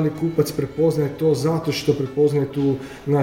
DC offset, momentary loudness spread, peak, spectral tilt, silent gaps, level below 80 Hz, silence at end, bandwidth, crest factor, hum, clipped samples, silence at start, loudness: under 0.1%; 4 LU; -6 dBFS; -7 dB/octave; none; -50 dBFS; 0 s; 16.5 kHz; 14 dB; none; under 0.1%; 0 s; -21 LUFS